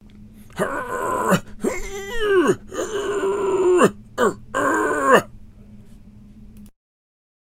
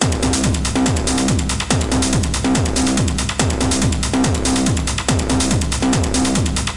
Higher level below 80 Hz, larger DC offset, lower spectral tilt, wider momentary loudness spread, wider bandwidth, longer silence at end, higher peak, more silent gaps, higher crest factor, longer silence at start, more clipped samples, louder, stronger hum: second, -42 dBFS vs -26 dBFS; second, under 0.1% vs 2%; about the same, -5 dB/octave vs -4 dB/octave; first, 11 LU vs 2 LU; first, 16 kHz vs 11.5 kHz; first, 0.8 s vs 0 s; about the same, 0 dBFS vs 0 dBFS; neither; first, 22 dB vs 16 dB; about the same, 0.05 s vs 0 s; neither; second, -21 LUFS vs -17 LUFS; neither